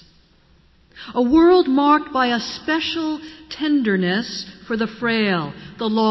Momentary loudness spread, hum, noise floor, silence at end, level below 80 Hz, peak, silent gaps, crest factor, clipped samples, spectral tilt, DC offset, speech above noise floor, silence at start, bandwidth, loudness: 14 LU; none; -54 dBFS; 0 s; -50 dBFS; -4 dBFS; none; 14 dB; under 0.1%; -6 dB/octave; under 0.1%; 36 dB; 0.95 s; 6.2 kHz; -19 LUFS